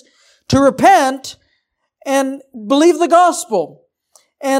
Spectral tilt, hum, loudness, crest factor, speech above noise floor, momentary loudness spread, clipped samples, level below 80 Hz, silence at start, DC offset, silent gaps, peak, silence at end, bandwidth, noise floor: -4.5 dB/octave; none; -13 LUFS; 14 dB; 54 dB; 18 LU; under 0.1%; -50 dBFS; 0.5 s; under 0.1%; none; 0 dBFS; 0 s; 16 kHz; -67 dBFS